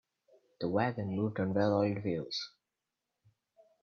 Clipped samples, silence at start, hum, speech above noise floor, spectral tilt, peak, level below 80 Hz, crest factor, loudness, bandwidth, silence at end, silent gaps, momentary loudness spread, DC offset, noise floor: under 0.1%; 0.6 s; none; 56 dB; -7 dB/octave; -16 dBFS; -72 dBFS; 20 dB; -33 LUFS; 6.8 kHz; 1.35 s; none; 9 LU; under 0.1%; -88 dBFS